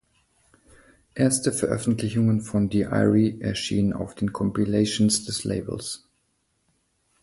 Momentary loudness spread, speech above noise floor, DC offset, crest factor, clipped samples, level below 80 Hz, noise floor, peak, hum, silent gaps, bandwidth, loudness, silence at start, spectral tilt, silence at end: 9 LU; 48 dB; under 0.1%; 18 dB; under 0.1%; -50 dBFS; -71 dBFS; -8 dBFS; none; none; 12 kHz; -24 LUFS; 1.15 s; -5 dB/octave; 1.25 s